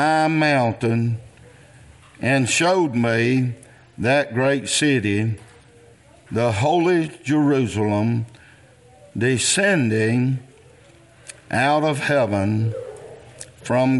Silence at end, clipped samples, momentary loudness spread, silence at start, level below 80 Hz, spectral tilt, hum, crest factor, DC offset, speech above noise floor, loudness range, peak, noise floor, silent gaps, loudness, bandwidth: 0 s; under 0.1%; 16 LU; 0 s; -58 dBFS; -5 dB/octave; none; 16 dB; under 0.1%; 30 dB; 2 LU; -4 dBFS; -50 dBFS; none; -20 LUFS; 11.5 kHz